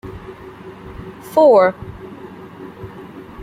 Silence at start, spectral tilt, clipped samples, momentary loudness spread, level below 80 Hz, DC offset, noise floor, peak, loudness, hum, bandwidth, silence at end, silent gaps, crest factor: 0.05 s; -7 dB/octave; under 0.1%; 25 LU; -46 dBFS; under 0.1%; -36 dBFS; -2 dBFS; -13 LUFS; none; 15.5 kHz; 0 s; none; 18 dB